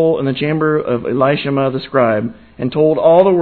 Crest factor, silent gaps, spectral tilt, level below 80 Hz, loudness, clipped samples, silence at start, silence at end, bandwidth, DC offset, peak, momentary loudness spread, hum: 14 dB; none; -10.5 dB/octave; -50 dBFS; -15 LUFS; under 0.1%; 0 s; 0 s; 4.5 kHz; 0.3%; 0 dBFS; 10 LU; none